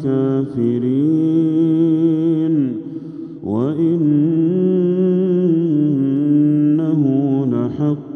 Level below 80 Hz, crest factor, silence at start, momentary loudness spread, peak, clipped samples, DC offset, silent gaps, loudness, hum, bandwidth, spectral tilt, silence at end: -62 dBFS; 10 dB; 0 s; 6 LU; -6 dBFS; under 0.1%; under 0.1%; none; -16 LUFS; none; 3.7 kHz; -11.5 dB/octave; 0 s